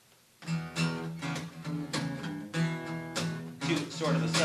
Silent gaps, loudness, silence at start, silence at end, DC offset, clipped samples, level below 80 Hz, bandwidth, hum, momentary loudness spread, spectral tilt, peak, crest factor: none; -34 LUFS; 0.4 s; 0 s; under 0.1%; under 0.1%; -68 dBFS; 13.5 kHz; none; 7 LU; -5 dB/octave; -14 dBFS; 18 dB